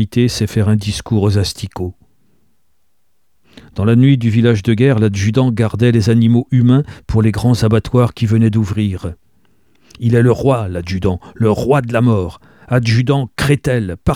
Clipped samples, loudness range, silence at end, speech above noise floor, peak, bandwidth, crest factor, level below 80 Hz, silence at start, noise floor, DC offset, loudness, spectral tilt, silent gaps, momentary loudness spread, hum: under 0.1%; 5 LU; 0 s; 55 dB; 0 dBFS; 13.5 kHz; 14 dB; -36 dBFS; 0 s; -68 dBFS; 0.2%; -14 LUFS; -7 dB/octave; none; 8 LU; none